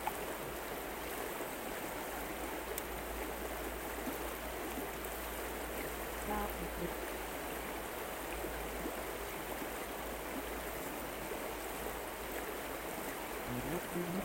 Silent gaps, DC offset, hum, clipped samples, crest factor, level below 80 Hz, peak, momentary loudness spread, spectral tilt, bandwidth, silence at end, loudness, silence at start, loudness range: none; under 0.1%; none; under 0.1%; 20 dB; -52 dBFS; -22 dBFS; 2 LU; -3.5 dB/octave; over 20 kHz; 0 s; -41 LUFS; 0 s; 1 LU